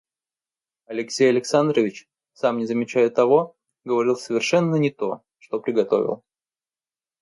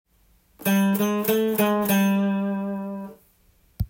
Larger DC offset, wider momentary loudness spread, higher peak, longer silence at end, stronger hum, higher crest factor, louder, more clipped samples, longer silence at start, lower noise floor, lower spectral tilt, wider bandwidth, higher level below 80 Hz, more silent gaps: neither; about the same, 13 LU vs 12 LU; first, -4 dBFS vs -8 dBFS; first, 1.05 s vs 0 s; neither; about the same, 18 dB vs 16 dB; about the same, -22 LUFS vs -23 LUFS; neither; first, 0.9 s vs 0.6 s; first, under -90 dBFS vs -61 dBFS; about the same, -5.5 dB/octave vs -6 dB/octave; second, 11.5 kHz vs 17 kHz; second, -72 dBFS vs -48 dBFS; neither